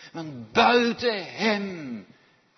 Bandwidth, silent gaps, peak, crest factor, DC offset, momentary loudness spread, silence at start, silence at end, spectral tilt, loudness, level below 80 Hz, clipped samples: 6.4 kHz; none; -6 dBFS; 18 dB; under 0.1%; 18 LU; 0 s; 0.55 s; -4.5 dB/octave; -23 LUFS; -64 dBFS; under 0.1%